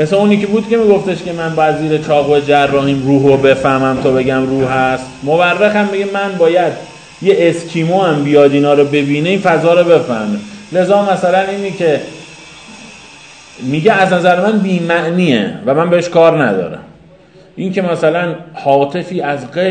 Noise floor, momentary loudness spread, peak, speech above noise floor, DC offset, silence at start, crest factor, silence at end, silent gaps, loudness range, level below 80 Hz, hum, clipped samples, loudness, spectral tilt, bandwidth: -41 dBFS; 10 LU; 0 dBFS; 30 dB; 0.1%; 0 s; 12 dB; 0 s; none; 4 LU; -48 dBFS; none; 0.2%; -12 LUFS; -6.5 dB/octave; 9.4 kHz